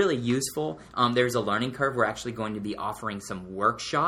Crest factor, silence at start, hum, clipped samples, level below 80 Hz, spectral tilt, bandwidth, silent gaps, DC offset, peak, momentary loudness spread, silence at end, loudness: 20 dB; 0 s; none; under 0.1%; -58 dBFS; -4.5 dB/octave; 16 kHz; none; under 0.1%; -8 dBFS; 9 LU; 0 s; -28 LUFS